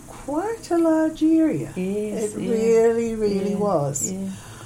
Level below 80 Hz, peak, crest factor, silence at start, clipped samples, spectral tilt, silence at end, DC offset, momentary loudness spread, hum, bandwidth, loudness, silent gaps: -50 dBFS; -8 dBFS; 14 dB; 0 s; under 0.1%; -6 dB/octave; 0 s; under 0.1%; 9 LU; none; 15.5 kHz; -22 LUFS; none